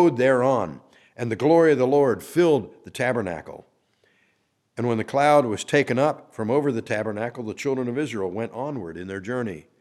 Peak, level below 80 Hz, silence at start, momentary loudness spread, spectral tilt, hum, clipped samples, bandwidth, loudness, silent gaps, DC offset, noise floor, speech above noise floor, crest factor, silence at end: -4 dBFS; -64 dBFS; 0 s; 15 LU; -6.5 dB/octave; none; under 0.1%; 14 kHz; -23 LUFS; none; under 0.1%; -69 dBFS; 47 dB; 18 dB; 0.2 s